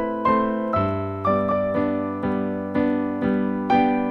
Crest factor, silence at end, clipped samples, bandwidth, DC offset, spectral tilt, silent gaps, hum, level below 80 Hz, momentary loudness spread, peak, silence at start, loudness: 14 dB; 0 s; under 0.1%; 5.8 kHz; under 0.1%; -9.5 dB/octave; none; none; -50 dBFS; 5 LU; -8 dBFS; 0 s; -22 LUFS